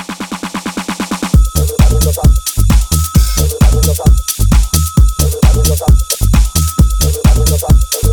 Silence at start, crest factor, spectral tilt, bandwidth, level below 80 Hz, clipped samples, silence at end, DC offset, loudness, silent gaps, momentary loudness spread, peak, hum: 0 s; 10 dB; -5 dB/octave; 19 kHz; -12 dBFS; under 0.1%; 0 s; under 0.1%; -12 LUFS; none; 8 LU; 0 dBFS; none